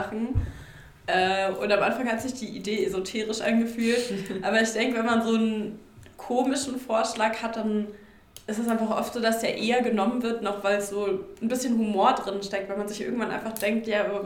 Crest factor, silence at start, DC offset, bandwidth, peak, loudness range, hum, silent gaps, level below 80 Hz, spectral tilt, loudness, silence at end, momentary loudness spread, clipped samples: 18 dB; 0 s; under 0.1%; 18.5 kHz; -8 dBFS; 2 LU; none; none; -48 dBFS; -4.5 dB/octave; -26 LUFS; 0 s; 8 LU; under 0.1%